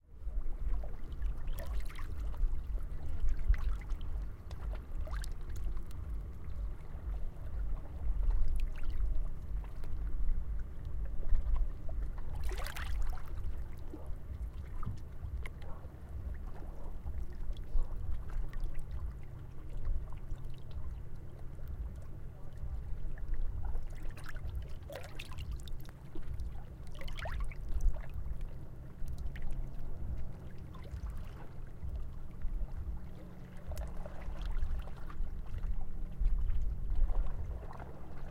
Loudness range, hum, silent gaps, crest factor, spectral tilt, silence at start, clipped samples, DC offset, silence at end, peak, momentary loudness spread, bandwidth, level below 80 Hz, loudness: 5 LU; none; none; 18 dB; -6.5 dB/octave; 0.1 s; under 0.1%; under 0.1%; 0 s; -16 dBFS; 9 LU; 6 kHz; -36 dBFS; -44 LUFS